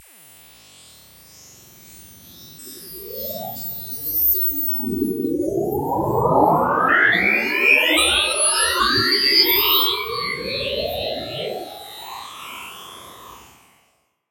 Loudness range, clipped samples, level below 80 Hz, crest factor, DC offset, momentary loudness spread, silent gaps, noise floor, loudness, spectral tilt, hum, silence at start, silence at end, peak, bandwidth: 17 LU; under 0.1%; -48 dBFS; 20 dB; under 0.1%; 20 LU; none; -64 dBFS; -17 LUFS; -2 dB/octave; none; 1.85 s; 0.9 s; -2 dBFS; 16 kHz